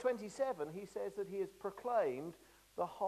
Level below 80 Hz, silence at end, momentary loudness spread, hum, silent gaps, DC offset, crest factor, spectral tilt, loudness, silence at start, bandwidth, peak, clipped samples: -76 dBFS; 0 s; 9 LU; none; none; under 0.1%; 18 dB; -5.5 dB/octave; -41 LUFS; 0 s; 14 kHz; -24 dBFS; under 0.1%